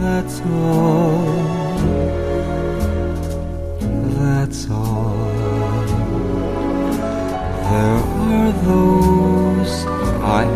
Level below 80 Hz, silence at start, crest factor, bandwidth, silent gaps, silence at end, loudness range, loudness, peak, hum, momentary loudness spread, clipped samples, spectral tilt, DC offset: -28 dBFS; 0 s; 16 dB; 14 kHz; none; 0 s; 4 LU; -18 LUFS; -2 dBFS; none; 7 LU; under 0.1%; -7.5 dB/octave; under 0.1%